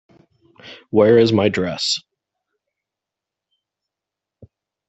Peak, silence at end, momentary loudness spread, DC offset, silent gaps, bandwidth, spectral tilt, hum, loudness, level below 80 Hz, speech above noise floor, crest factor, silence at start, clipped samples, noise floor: -2 dBFS; 2.9 s; 8 LU; under 0.1%; none; 8.2 kHz; -5 dB/octave; none; -17 LUFS; -60 dBFS; 70 dB; 18 dB; 0.65 s; under 0.1%; -85 dBFS